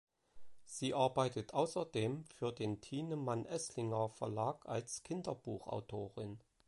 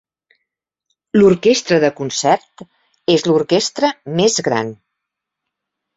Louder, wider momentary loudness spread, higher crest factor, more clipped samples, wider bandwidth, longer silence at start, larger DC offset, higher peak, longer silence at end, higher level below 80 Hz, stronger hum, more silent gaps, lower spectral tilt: second, -41 LUFS vs -15 LUFS; about the same, 9 LU vs 7 LU; about the same, 20 dB vs 16 dB; neither; first, 11.5 kHz vs 8 kHz; second, 0.35 s vs 1.15 s; neither; second, -20 dBFS vs -2 dBFS; second, 0.3 s vs 1.2 s; second, -72 dBFS vs -58 dBFS; neither; neither; about the same, -5.5 dB/octave vs -4.5 dB/octave